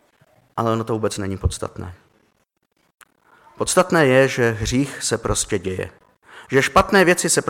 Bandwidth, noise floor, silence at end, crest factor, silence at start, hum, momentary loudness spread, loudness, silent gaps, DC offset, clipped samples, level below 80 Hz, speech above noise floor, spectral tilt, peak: 17 kHz; -67 dBFS; 0 s; 18 dB; 0.55 s; none; 15 LU; -19 LUFS; 2.94-2.98 s; under 0.1%; under 0.1%; -40 dBFS; 48 dB; -4 dB/octave; -4 dBFS